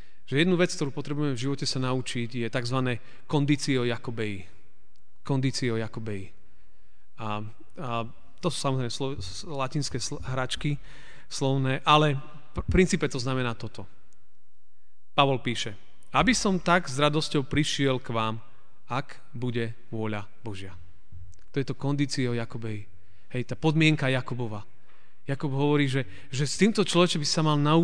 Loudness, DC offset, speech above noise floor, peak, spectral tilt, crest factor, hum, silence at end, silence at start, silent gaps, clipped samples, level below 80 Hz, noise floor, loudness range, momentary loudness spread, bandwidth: -27 LUFS; 2%; 46 dB; -6 dBFS; -5 dB/octave; 24 dB; none; 0 s; 0.3 s; none; under 0.1%; -50 dBFS; -73 dBFS; 8 LU; 14 LU; 10 kHz